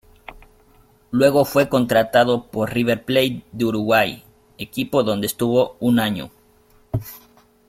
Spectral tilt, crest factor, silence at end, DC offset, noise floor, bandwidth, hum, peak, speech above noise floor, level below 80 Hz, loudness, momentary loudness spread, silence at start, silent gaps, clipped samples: -5.5 dB/octave; 18 dB; 0.5 s; under 0.1%; -55 dBFS; 16.5 kHz; none; -2 dBFS; 36 dB; -50 dBFS; -19 LUFS; 13 LU; 0.3 s; none; under 0.1%